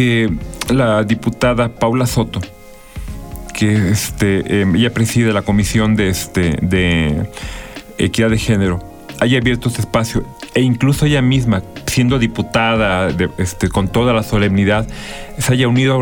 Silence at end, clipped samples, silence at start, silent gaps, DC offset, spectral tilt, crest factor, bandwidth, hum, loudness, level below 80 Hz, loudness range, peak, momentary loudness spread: 0 s; under 0.1%; 0 s; none; under 0.1%; -5.5 dB/octave; 12 dB; over 20 kHz; none; -15 LUFS; -32 dBFS; 2 LU; -2 dBFS; 12 LU